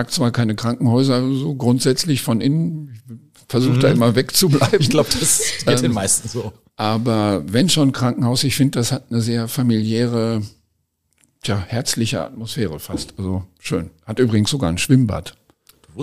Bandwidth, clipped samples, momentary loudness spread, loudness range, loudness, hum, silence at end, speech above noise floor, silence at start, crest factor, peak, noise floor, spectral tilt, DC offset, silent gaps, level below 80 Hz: 15.5 kHz; under 0.1%; 11 LU; 7 LU; -18 LUFS; none; 0 s; 51 dB; 0 s; 16 dB; -2 dBFS; -68 dBFS; -5 dB/octave; 0.6%; none; -46 dBFS